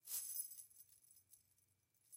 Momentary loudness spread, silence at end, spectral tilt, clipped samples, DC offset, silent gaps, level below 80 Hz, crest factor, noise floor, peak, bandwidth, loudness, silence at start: 24 LU; 0 s; 2.5 dB/octave; under 0.1%; under 0.1%; none; under -90 dBFS; 22 dB; -81 dBFS; -32 dBFS; 16 kHz; -47 LUFS; 0.05 s